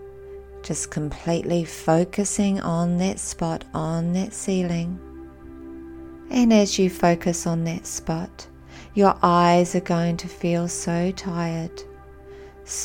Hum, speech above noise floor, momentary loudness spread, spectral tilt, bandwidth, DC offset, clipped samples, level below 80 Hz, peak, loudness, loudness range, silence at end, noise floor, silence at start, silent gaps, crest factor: none; 21 dB; 23 LU; -5.5 dB/octave; 16.5 kHz; under 0.1%; under 0.1%; -46 dBFS; -2 dBFS; -23 LUFS; 5 LU; 0 s; -43 dBFS; 0 s; none; 20 dB